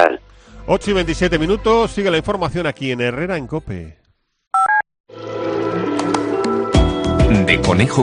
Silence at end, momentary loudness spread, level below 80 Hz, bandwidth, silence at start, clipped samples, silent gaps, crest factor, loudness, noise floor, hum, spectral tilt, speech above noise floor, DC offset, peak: 0 s; 12 LU; -28 dBFS; 10 kHz; 0 s; under 0.1%; 4.47-4.51 s, 5.00-5.04 s; 16 dB; -17 LUFS; -40 dBFS; none; -6 dB/octave; 23 dB; under 0.1%; 0 dBFS